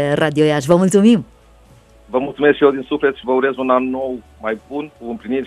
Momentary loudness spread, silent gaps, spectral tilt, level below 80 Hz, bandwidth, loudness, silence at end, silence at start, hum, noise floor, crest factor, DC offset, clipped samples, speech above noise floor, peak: 14 LU; none; -6 dB/octave; -50 dBFS; 13.5 kHz; -16 LUFS; 0 s; 0 s; none; -47 dBFS; 16 dB; under 0.1%; under 0.1%; 31 dB; 0 dBFS